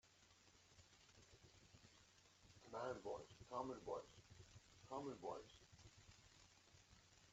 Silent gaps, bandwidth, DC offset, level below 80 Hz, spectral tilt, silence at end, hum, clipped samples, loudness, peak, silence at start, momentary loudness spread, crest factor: none; 8 kHz; under 0.1%; -78 dBFS; -4.5 dB/octave; 0 s; none; under 0.1%; -54 LUFS; -34 dBFS; 0.05 s; 19 LU; 24 dB